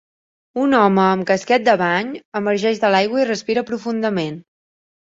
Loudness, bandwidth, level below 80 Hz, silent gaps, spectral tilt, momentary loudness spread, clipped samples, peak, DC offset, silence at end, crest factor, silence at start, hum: -18 LUFS; 7.8 kHz; -62 dBFS; 2.25-2.32 s; -5.5 dB/octave; 10 LU; under 0.1%; -2 dBFS; under 0.1%; 0.65 s; 16 dB; 0.55 s; none